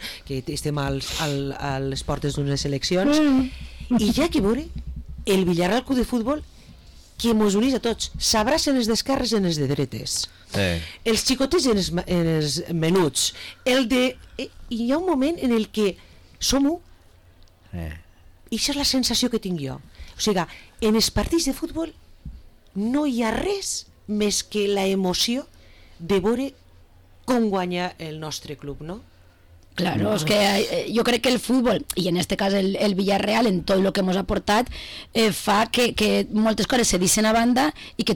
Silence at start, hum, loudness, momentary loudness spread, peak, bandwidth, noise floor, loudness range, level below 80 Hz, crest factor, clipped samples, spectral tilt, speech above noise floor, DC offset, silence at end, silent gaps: 0 s; none; -22 LUFS; 12 LU; -10 dBFS; 19 kHz; -51 dBFS; 5 LU; -42 dBFS; 12 dB; under 0.1%; -4 dB/octave; 29 dB; under 0.1%; 0 s; none